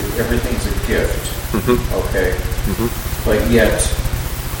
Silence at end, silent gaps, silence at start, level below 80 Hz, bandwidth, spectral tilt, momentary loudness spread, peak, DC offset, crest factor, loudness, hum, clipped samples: 0 s; none; 0 s; -22 dBFS; 17 kHz; -5 dB/octave; 8 LU; 0 dBFS; under 0.1%; 18 dB; -18 LUFS; none; under 0.1%